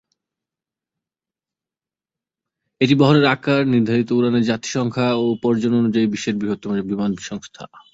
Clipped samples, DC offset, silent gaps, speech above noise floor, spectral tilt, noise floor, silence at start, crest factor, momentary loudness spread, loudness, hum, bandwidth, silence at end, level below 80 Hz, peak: under 0.1%; under 0.1%; none; over 72 dB; -6 dB/octave; under -90 dBFS; 2.8 s; 18 dB; 9 LU; -18 LUFS; none; 7.8 kHz; 0.15 s; -58 dBFS; -2 dBFS